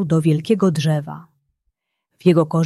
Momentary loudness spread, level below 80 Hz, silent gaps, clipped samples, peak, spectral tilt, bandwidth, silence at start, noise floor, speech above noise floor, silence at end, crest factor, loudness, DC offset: 13 LU; -60 dBFS; none; under 0.1%; -2 dBFS; -7.5 dB/octave; 12 kHz; 0 s; -74 dBFS; 57 dB; 0 s; 16 dB; -18 LUFS; under 0.1%